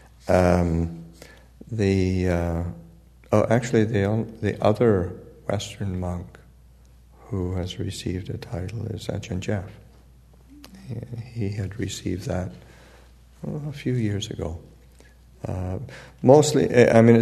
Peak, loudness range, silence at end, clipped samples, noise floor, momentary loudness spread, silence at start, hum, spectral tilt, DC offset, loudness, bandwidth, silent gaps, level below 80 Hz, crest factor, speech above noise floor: 0 dBFS; 9 LU; 0 s; under 0.1%; -51 dBFS; 18 LU; 0.25 s; none; -6.5 dB/octave; under 0.1%; -24 LUFS; 13.5 kHz; none; -46 dBFS; 24 dB; 29 dB